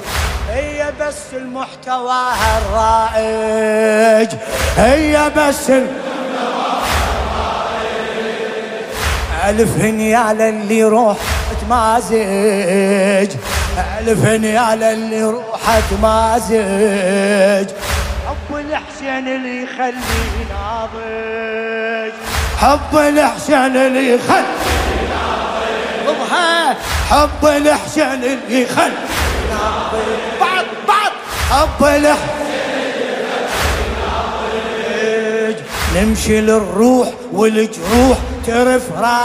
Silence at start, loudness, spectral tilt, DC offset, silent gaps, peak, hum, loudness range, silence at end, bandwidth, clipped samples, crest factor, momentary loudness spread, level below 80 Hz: 0 s; -15 LUFS; -4.5 dB/octave; under 0.1%; none; 0 dBFS; none; 5 LU; 0 s; 16 kHz; under 0.1%; 14 dB; 9 LU; -28 dBFS